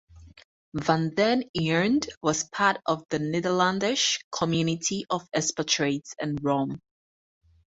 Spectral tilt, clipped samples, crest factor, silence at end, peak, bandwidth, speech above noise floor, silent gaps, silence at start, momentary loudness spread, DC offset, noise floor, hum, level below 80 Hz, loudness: -4 dB/octave; under 0.1%; 20 dB; 1 s; -6 dBFS; 8 kHz; over 64 dB; 0.44-0.72 s, 1.49-1.54 s, 2.17-2.21 s, 4.24-4.31 s; 0.15 s; 6 LU; under 0.1%; under -90 dBFS; none; -60 dBFS; -26 LUFS